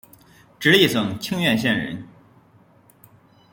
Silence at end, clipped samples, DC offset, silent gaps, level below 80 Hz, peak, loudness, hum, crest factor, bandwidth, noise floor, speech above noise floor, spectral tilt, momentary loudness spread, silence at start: 1.45 s; under 0.1%; under 0.1%; none; -58 dBFS; -2 dBFS; -19 LUFS; none; 20 dB; 17 kHz; -54 dBFS; 35 dB; -4.5 dB/octave; 13 LU; 0.6 s